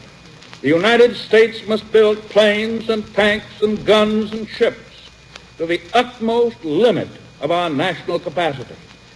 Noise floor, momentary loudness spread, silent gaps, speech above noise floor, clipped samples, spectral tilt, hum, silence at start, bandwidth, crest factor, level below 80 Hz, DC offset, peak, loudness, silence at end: -42 dBFS; 10 LU; none; 25 dB; under 0.1%; -5 dB/octave; none; 0.55 s; 11 kHz; 16 dB; -52 dBFS; under 0.1%; -2 dBFS; -17 LUFS; 0.4 s